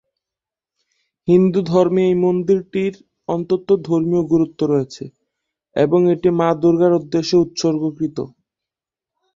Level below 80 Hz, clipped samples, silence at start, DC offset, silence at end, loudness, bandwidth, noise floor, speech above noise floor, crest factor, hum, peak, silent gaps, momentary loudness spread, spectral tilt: -56 dBFS; under 0.1%; 1.25 s; under 0.1%; 1.1 s; -17 LUFS; 7.6 kHz; -88 dBFS; 71 dB; 16 dB; none; -2 dBFS; none; 12 LU; -7.5 dB/octave